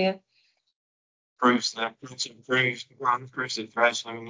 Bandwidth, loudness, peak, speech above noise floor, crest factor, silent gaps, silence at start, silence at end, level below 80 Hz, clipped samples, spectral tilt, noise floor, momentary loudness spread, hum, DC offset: 7.6 kHz; -26 LUFS; -8 dBFS; 42 dB; 20 dB; 0.76-1.36 s; 0 s; 0 s; -76 dBFS; under 0.1%; -3.5 dB/octave; -69 dBFS; 10 LU; none; under 0.1%